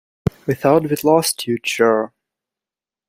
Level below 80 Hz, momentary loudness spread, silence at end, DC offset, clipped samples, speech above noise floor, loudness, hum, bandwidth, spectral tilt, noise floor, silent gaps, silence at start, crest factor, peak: -50 dBFS; 9 LU; 1 s; under 0.1%; under 0.1%; 73 dB; -18 LUFS; none; 16 kHz; -4.5 dB/octave; -90 dBFS; none; 0.45 s; 18 dB; -2 dBFS